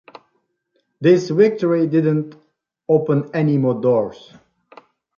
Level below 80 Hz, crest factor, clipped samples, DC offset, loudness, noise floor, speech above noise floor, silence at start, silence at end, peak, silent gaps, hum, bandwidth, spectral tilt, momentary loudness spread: -64 dBFS; 16 dB; under 0.1%; under 0.1%; -18 LUFS; -69 dBFS; 52 dB; 1 s; 1.05 s; -2 dBFS; none; none; 7.2 kHz; -8.5 dB/octave; 8 LU